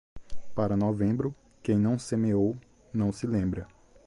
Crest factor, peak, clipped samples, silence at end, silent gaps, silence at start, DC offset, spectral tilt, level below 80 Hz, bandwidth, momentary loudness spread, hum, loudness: 14 dB; -14 dBFS; under 0.1%; 0.4 s; none; 0.15 s; under 0.1%; -8 dB/octave; -50 dBFS; 11.5 kHz; 11 LU; none; -29 LUFS